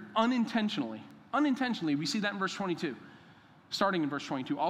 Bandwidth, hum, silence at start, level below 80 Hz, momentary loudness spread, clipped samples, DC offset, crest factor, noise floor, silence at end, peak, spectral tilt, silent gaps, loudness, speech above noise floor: 13.5 kHz; none; 0 s; -80 dBFS; 10 LU; under 0.1%; under 0.1%; 20 dB; -58 dBFS; 0 s; -12 dBFS; -5 dB/octave; none; -32 LUFS; 26 dB